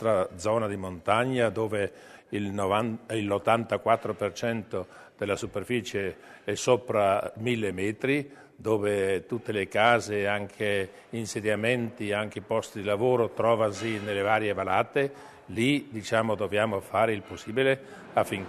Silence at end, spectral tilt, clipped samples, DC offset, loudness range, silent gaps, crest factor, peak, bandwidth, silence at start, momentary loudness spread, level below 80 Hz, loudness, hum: 0 s; -5 dB/octave; under 0.1%; under 0.1%; 2 LU; none; 22 dB; -6 dBFS; 13.5 kHz; 0 s; 8 LU; -64 dBFS; -28 LUFS; none